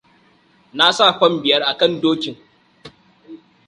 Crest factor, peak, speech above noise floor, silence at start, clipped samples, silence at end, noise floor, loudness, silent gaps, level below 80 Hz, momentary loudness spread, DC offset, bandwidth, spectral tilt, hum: 20 dB; 0 dBFS; 39 dB; 0.75 s; under 0.1%; 0.3 s; -55 dBFS; -15 LUFS; none; -64 dBFS; 12 LU; under 0.1%; 11.5 kHz; -3.5 dB/octave; none